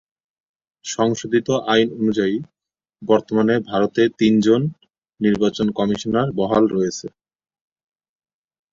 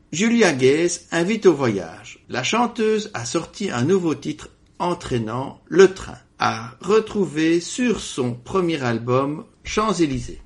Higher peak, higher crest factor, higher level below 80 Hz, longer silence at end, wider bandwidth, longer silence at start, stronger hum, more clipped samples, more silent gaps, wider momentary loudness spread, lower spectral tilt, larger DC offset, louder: about the same, -2 dBFS vs 0 dBFS; about the same, 18 dB vs 20 dB; second, -56 dBFS vs -48 dBFS; first, 1.65 s vs 0.05 s; second, 7.6 kHz vs 11.5 kHz; first, 0.85 s vs 0.1 s; neither; neither; neither; about the same, 11 LU vs 12 LU; about the same, -5.5 dB/octave vs -5 dB/octave; neither; about the same, -19 LUFS vs -21 LUFS